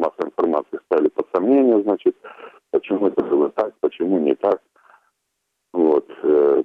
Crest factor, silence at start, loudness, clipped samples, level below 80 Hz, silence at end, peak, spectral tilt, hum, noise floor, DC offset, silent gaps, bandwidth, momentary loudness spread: 14 dB; 0 s; -20 LUFS; under 0.1%; -66 dBFS; 0 s; -6 dBFS; -8.5 dB/octave; none; -75 dBFS; under 0.1%; none; 4.7 kHz; 9 LU